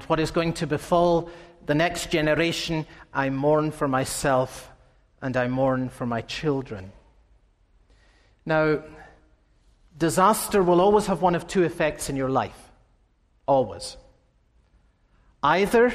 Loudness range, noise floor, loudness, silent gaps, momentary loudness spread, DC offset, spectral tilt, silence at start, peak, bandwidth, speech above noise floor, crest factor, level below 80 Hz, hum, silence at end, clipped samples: 7 LU; -63 dBFS; -24 LUFS; none; 12 LU; under 0.1%; -5 dB/octave; 0 s; -6 dBFS; 15.5 kHz; 40 dB; 18 dB; -48 dBFS; none; 0 s; under 0.1%